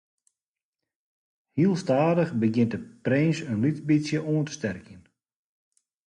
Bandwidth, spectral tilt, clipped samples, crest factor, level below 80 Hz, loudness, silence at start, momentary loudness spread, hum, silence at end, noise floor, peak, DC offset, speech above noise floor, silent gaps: 10 kHz; -7 dB/octave; under 0.1%; 16 dB; -64 dBFS; -25 LUFS; 1.55 s; 10 LU; none; 1.05 s; under -90 dBFS; -10 dBFS; under 0.1%; over 65 dB; none